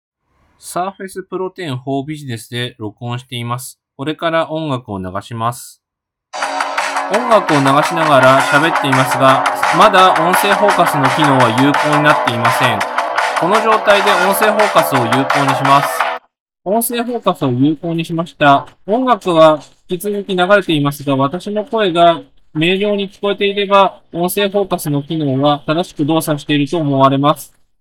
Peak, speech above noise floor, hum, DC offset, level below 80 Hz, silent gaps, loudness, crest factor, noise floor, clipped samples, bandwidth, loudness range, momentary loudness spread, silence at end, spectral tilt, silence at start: 0 dBFS; 62 dB; none; under 0.1%; -56 dBFS; 16.40-16.46 s; -14 LUFS; 14 dB; -76 dBFS; under 0.1%; 18 kHz; 11 LU; 13 LU; 0.35 s; -5 dB/octave; 0.65 s